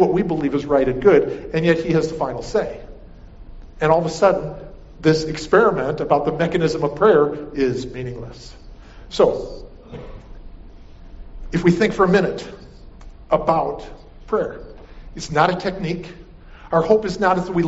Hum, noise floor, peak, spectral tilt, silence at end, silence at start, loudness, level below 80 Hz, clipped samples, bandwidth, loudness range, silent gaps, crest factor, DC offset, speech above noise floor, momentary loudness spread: none; -41 dBFS; -2 dBFS; -5.5 dB/octave; 0 s; 0 s; -19 LUFS; -40 dBFS; under 0.1%; 8 kHz; 6 LU; none; 18 dB; under 0.1%; 22 dB; 21 LU